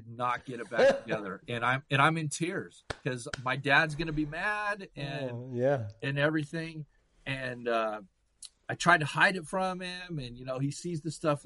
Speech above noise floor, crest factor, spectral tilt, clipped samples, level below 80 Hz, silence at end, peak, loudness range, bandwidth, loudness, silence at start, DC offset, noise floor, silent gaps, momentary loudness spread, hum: 23 dB; 22 dB; -5 dB/octave; under 0.1%; -58 dBFS; 0.05 s; -8 dBFS; 3 LU; 11.5 kHz; -30 LUFS; 0 s; under 0.1%; -54 dBFS; none; 14 LU; none